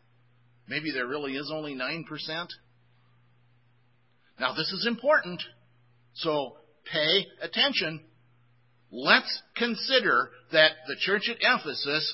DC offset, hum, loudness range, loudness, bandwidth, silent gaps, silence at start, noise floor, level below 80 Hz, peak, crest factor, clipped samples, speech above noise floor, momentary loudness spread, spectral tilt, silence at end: under 0.1%; none; 10 LU; -26 LUFS; 5.8 kHz; none; 0.7 s; -67 dBFS; -80 dBFS; -2 dBFS; 26 dB; under 0.1%; 39 dB; 14 LU; -6.5 dB/octave; 0 s